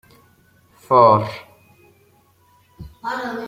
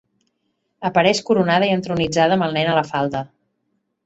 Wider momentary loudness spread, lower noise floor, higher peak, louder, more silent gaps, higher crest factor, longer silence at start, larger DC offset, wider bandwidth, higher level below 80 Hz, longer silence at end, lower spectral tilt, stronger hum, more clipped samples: first, 19 LU vs 9 LU; second, -56 dBFS vs -71 dBFS; about the same, -2 dBFS vs -2 dBFS; about the same, -17 LUFS vs -18 LUFS; neither; about the same, 20 dB vs 18 dB; about the same, 0.9 s vs 0.8 s; neither; first, 16 kHz vs 8.2 kHz; about the same, -54 dBFS vs -54 dBFS; second, 0 s vs 0.8 s; first, -7 dB/octave vs -5 dB/octave; neither; neither